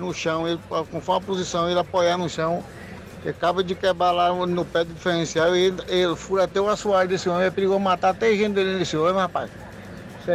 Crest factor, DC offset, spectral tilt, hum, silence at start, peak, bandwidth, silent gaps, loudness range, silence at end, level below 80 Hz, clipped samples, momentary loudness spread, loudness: 12 dB; under 0.1%; -5 dB/octave; none; 0 s; -10 dBFS; 14 kHz; none; 3 LU; 0 s; -50 dBFS; under 0.1%; 12 LU; -22 LUFS